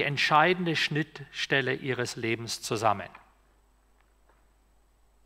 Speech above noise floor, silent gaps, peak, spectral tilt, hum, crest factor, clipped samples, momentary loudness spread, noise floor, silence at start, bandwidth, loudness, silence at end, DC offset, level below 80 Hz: 36 dB; none; -8 dBFS; -4 dB/octave; none; 22 dB; under 0.1%; 12 LU; -64 dBFS; 0 s; 16 kHz; -27 LUFS; 2.1 s; under 0.1%; -64 dBFS